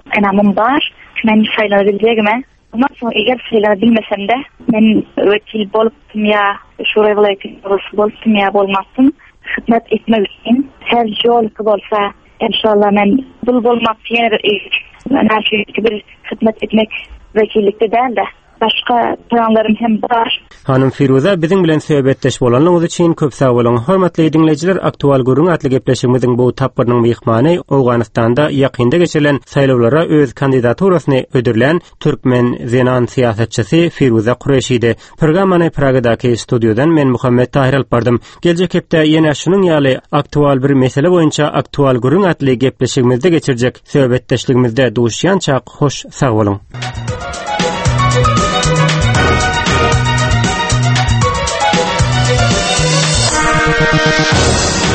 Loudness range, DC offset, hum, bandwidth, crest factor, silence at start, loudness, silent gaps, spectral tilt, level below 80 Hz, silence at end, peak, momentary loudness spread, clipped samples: 2 LU; under 0.1%; none; 8.8 kHz; 12 dB; 0.05 s; -12 LUFS; none; -5.5 dB/octave; -32 dBFS; 0 s; 0 dBFS; 6 LU; under 0.1%